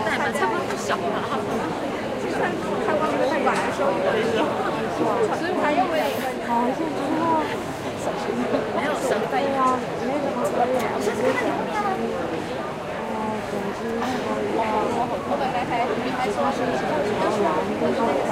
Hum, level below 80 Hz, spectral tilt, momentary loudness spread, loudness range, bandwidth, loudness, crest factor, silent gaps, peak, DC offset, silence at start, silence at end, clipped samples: none; -52 dBFS; -5 dB/octave; 6 LU; 3 LU; 16 kHz; -24 LUFS; 16 dB; none; -8 dBFS; under 0.1%; 0 s; 0 s; under 0.1%